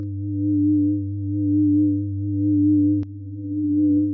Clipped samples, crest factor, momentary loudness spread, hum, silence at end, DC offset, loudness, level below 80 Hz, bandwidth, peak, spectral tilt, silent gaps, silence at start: under 0.1%; 10 dB; 9 LU; none; 0 s; under 0.1%; -21 LUFS; -42 dBFS; 0.6 kHz; -10 dBFS; -15.5 dB/octave; none; 0 s